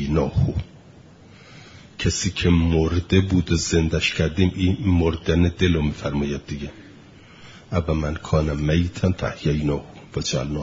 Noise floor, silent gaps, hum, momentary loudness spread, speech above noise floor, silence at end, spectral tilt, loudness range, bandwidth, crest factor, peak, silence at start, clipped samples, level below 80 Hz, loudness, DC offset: -47 dBFS; none; none; 9 LU; 26 dB; 0 s; -6 dB/octave; 5 LU; 7.8 kHz; 18 dB; -4 dBFS; 0 s; under 0.1%; -36 dBFS; -22 LUFS; under 0.1%